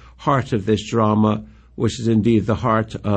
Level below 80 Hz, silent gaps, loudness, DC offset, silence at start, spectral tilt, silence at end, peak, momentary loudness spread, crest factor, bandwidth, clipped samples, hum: -44 dBFS; none; -19 LUFS; under 0.1%; 0.2 s; -7 dB/octave; 0 s; -4 dBFS; 6 LU; 14 dB; 8.8 kHz; under 0.1%; none